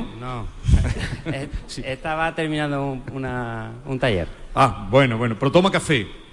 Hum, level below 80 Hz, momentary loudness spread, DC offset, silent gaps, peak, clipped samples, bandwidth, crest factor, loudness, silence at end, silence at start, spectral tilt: none; -32 dBFS; 13 LU; under 0.1%; none; -4 dBFS; under 0.1%; 11.5 kHz; 18 dB; -22 LUFS; 0 s; 0 s; -6 dB/octave